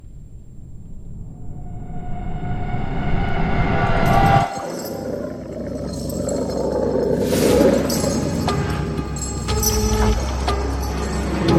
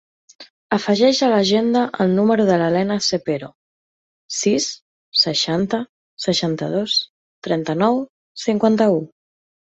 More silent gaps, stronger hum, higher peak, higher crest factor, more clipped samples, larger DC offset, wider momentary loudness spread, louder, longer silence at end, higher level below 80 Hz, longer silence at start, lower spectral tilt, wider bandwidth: second, none vs 0.50-0.70 s, 3.55-4.29 s, 4.82-5.12 s, 5.89-6.17 s, 7.09-7.42 s, 8.10-8.35 s; neither; about the same, -2 dBFS vs -2 dBFS; about the same, 18 dB vs 18 dB; neither; neither; first, 19 LU vs 11 LU; about the same, -21 LUFS vs -19 LUFS; second, 0 s vs 0.65 s; first, -28 dBFS vs -60 dBFS; second, 0.05 s vs 0.4 s; about the same, -5.5 dB/octave vs -4.5 dB/octave; first, 16.5 kHz vs 8.2 kHz